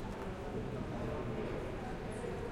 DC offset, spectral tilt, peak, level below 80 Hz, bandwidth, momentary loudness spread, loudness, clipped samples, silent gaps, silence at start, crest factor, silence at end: under 0.1%; -7 dB/octave; -28 dBFS; -48 dBFS; 16.5 kHz; 3 LU; -41 LUFS; under 0.1%; none; 0 s; 12 dB; 0 s